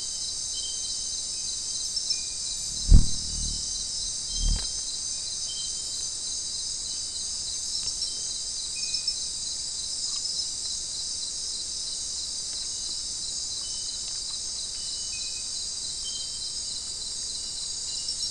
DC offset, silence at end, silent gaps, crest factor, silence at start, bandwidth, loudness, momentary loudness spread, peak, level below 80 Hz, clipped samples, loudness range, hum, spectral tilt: 0.2%; 0 s; none; 24 dB; 0 s; 12 kHz; -28 LUFS; 3 LU; -6 dBFS; -34 dBFS; under 0.1%; 3 LU; none; -1 dB/octave